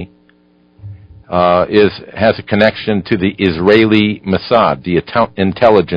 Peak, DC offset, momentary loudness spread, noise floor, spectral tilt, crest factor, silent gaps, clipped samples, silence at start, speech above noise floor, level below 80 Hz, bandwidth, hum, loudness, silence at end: 0 dBFS; under 0.1%; 6 LU; -51 dBFS; -8.5 dB/octave; 14 dB; none; 0.1%; 0 s; 39 dB; -38 dBFS; 6 kHz; 60 Hz at -40 dBFS; -13 LUFS; 0 s